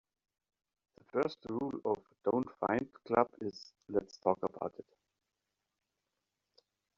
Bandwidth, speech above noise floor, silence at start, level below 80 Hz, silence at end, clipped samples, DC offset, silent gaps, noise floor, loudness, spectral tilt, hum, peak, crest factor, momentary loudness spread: 7.4 kHz; 52 dB; 1.15 s; -74 dBFS; 2.15 s; under 0.1%; under 0.1%; none; -88 dBFS; -36 LUFS; -5.5 dB/octave; none; -12 dBFS; 26 dB; 11 LU